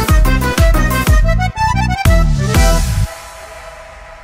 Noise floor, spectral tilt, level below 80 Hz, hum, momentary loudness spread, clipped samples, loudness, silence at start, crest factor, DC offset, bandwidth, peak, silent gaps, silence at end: -34 dBFS; -5 dB/octave; -14 dBFS; none; 19 LU; under 0.1%; -14 LUFS; 0 s; 12 dB; under 0.1%; 16.5 kHz; 0 dBFS; none; 0 s